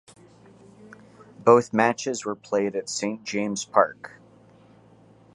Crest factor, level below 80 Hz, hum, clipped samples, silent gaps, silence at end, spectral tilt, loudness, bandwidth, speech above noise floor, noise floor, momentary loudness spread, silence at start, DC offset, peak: 22 dB; -70 dBFS; none; under 0.1%; none; 1.3 s; -4.5 dB/octave; -24 LUFS; 11 kHz; 31 dB; -54 dBFS; 11 LU; 1.4 s; under 0.1%; -4 dBFS